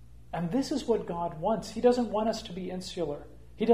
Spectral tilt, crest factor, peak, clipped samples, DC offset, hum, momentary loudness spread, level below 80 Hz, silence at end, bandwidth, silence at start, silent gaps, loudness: -6 dB/octave; 18 dB; -10 dBFS; under 0.1%; 0.3%; none; 11 LU; -54 dBFS; 0 s; 15 kHz; 0 s; none; -31 LUFS